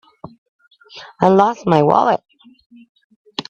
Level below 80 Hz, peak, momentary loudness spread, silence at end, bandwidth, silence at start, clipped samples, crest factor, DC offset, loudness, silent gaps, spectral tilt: -58 dBFS; 0 dBFS; 21 LU; 0.1 s; 7.8 kHz; 0.25 s; under 0.1%; 18 dB; under 0.1%; -15 LUFS; 0.38-0.59 s, 2.66-2.70 s, 2.89-2.95 s, 3.04-3.10 s, 3.16-3.25 s; -7 dB/octave